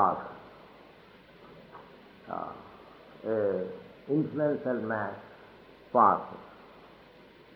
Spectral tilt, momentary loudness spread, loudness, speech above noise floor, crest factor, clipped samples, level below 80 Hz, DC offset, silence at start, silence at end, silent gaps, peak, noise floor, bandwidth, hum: -9.5 dB/octave; 28 LU; -30 LUFS; 27 dB; 24 dB; under 0.1%; -70 dBFS; under 0.1%; 0 s; 0.7 s; none; -10 dBFS; -55 dBFS; 5.8 kHz; none